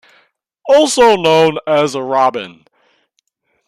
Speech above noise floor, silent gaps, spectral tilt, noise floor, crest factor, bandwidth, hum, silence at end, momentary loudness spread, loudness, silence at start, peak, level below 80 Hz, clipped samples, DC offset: 53 dB; none; -3.5 dB/octave; -65 dBFS; 14 dB; 14.5 kHz; none; 1.15 s; 16 LU; -12 LUFS; 0.65 s; 0 dBFS; -54 dBFS; under 0.1%; under 0.1%